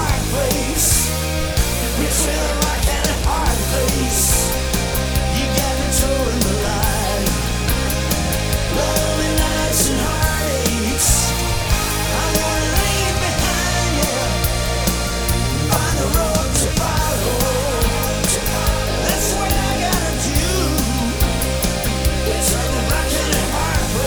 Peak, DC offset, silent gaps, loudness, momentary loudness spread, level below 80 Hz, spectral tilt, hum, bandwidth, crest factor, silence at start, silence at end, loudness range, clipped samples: -2 dBFS; under 0.1%; none; -18 LUFS; 3 LU; -22 dBFS; -3.5 dB/octave; none; over 20 kHz; 16 dB; 0 s; 0 s; 1 LU; under 0.1%